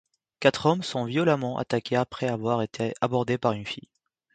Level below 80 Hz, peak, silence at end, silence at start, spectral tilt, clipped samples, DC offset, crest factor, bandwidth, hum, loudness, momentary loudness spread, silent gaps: -62 dBFS; -4 dBFS; 0.55 s; 0.4 s; -6 dB/octave; under 0.1%; under 0.1%; 22 dB; 9.4 kHz; none; -26 LUFS; 6 LU; none